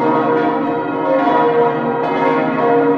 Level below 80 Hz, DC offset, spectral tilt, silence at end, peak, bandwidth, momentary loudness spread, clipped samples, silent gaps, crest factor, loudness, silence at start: -58 dBFS; under 0.1%; -8 dB/octave; 0 s; -2 dBFS; 6 kHz; 5 LU; under 0.1%; none; 12 dB; -15 LUFS; 0 s